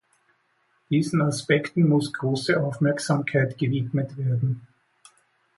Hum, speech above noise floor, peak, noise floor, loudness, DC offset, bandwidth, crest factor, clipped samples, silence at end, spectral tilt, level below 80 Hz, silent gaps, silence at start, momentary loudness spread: none; 45 dB; -8 dBFS; -68 dBFS; -24 LUFS; under 0.1%; 11.5 kHz; 16 dB; under 0.1%; 0.95 s; -6.5 dB/octave; -62 dBFS; none; 0.9 s; 6 LU